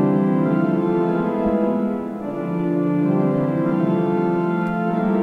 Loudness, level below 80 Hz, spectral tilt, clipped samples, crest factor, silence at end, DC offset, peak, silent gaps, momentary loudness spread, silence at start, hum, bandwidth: -20 LUFS; -52 dBFS; -10.5 dB/octave; under 0.1%; 12 dB; 0 s; under 0.1%; -8 dBFS; none; 5 LU; 0 s; none; 4.7 kHz